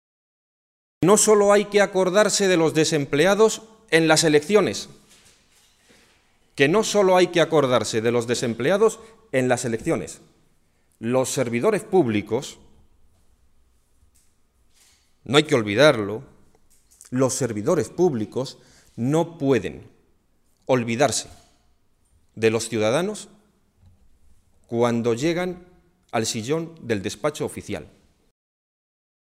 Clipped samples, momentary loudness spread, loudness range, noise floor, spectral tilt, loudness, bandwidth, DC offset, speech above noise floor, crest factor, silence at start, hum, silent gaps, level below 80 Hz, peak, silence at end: under 0.1%; 14 LU; 9 LU; -63 dBFS; -4 dB/octave; -21 LUFS; 15.5 kHz; under 0.1%; 42 dB; 22 dB; 1 s; none; none; -58 dBFS; -2 dBFS; 1.45 s